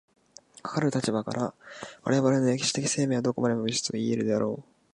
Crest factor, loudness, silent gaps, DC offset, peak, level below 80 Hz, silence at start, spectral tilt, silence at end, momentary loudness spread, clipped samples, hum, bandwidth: 18 dB; -27 LUFS; none; under 0.1%; -10 dBFS; -68 dBFS; 0.65 s; -5 dB/octave; 0.3 s; 11 LU; under 0.1%; none; 11.5 kHz